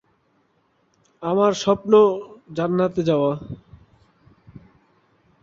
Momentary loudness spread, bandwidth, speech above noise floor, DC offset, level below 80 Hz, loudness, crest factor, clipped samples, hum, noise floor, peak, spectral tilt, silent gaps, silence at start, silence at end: 17 LU; 7.6 kHz; 46 dB; under 0.1%; -58 dBFS; -20 LUFS; 20 dB; under 0.1%; none; -65 dBFS; -2 dBFS; -6.5 dB/octave; none; 1.2 s; 0.85 s